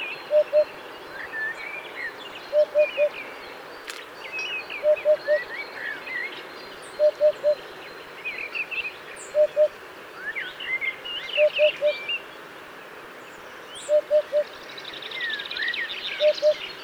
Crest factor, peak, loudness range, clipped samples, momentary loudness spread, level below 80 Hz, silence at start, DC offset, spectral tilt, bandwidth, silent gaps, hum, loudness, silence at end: 18 dB; -8 dBFS; 3 LU; under 0.1%; 18 LU; -70 dBFS; 0 s; under 0.1%; -2 dB/octave; 16.5 kHz; none; none; -25 LUFS; 0 s